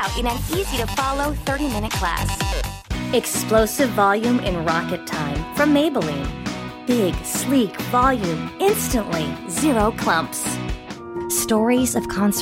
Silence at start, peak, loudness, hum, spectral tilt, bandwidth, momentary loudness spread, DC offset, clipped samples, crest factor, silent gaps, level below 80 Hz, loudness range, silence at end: 0 s; -4 dBFS; -21 LUFS; none; -4.5 dB/octave; 16.5 kHz; 9 LU; under 0.1%; under 0.1%; 18 dB; none; -34 dBFS; 2 LU; 0 s